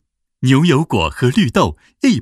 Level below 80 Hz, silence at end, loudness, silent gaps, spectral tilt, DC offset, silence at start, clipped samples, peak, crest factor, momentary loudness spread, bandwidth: -38 dBFS; 0 s; -15 LUFS; none; -6 dB/octave; under 0.1%; 0.4 s; under 0.1%; 0 dBFS; 16 dB; 6 LU; 13.5 kHz